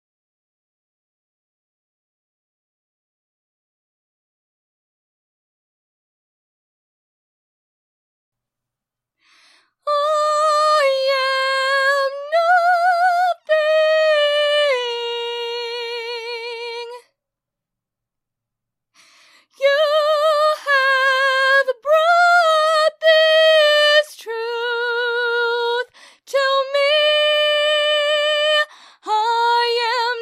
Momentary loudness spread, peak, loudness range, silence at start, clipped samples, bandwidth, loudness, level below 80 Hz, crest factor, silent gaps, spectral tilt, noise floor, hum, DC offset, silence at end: 12 LU; -2 dBFS; 13 LU; 9.85 s; under 0.1%; 14 kHz; -16 LUFS; -88 dBFS; 16 dB; none; 3.5 dB/octave; -85 dBFS; none; under 0.1%; 0 s